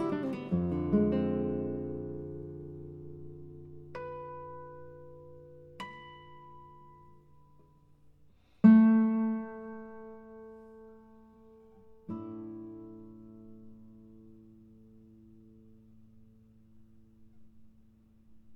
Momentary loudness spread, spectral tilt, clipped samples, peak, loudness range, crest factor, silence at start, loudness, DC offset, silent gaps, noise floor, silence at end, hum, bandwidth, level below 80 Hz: 27 LU; -10 dB/octave; under 0.1%; -10 dBFS; 23 LU; 24 dB; 0 s; -30 LUFS; under 0.1%; none; -62 dBFS; 0 s; 60 Hz at -85 dBFS; 4.2 kHz; -68 dBFS